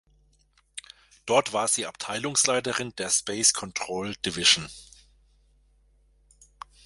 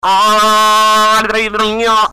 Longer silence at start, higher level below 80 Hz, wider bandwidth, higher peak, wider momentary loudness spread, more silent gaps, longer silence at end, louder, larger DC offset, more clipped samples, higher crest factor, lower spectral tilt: first, 0.75 s vs 0.05 s; second, -60 dBFS vs -42 dBFS; second, 12 kHz vs 16 kHz; about the same, -4 dBFS vs -6 dBFS; first, 22 LU vs 5 LU; neither; first, 2 s vs 0 s; second, -24 LUFS vs -10 LUFS; neither; neither; first, 26 dB vs 4 dB; about the same, -1 dB/octave vs -1.5 dB/octave